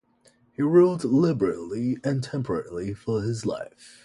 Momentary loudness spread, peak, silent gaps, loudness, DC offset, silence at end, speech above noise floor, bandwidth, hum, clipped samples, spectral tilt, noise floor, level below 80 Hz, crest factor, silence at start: 13 LU; -6 dBFS; none; -25 LUFS; under 0.1%; 0.2 s; 37 dB; 11.5 kHz; none; under 0.1%; -7.5 dB/octave; -62 dBFS; -56 dBFS; 18 dB; 0.6 s